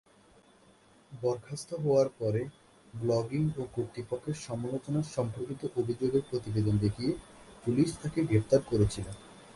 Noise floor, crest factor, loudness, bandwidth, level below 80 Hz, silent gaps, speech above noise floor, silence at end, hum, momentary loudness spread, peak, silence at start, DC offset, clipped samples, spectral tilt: -61 dBFS; 18 dB; -32 LUFS; 11.5 kHz; -54 dBFS; none; 31 dB; 0.05 s; none; 11 LU; -12 dBFS; 1.1 s; under 0.1%; under 0.1%; -7 dB/octave